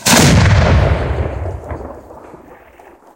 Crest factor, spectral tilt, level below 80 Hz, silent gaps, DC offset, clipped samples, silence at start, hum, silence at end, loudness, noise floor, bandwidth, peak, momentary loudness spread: 14 dB; -4.5 dB/octave; -22 dBFS; none; under 0.1%; under 0.1%; 0 s; none; 0.8 s; -12 LUFS; -42 dBFS; 17 kHz; 0 dBFS; 21 LU